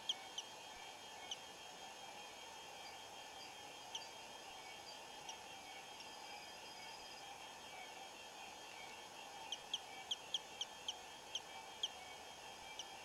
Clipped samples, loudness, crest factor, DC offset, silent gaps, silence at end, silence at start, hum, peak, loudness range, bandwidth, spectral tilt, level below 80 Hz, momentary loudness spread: under 0.1%; -50 LUFS; 22 dB; under 0.1%; none; 0 s; 0 s; none; -30 dBFS; 6 LU; 16 kHz; 0 dB/octave; -82 dBFS; 7 LU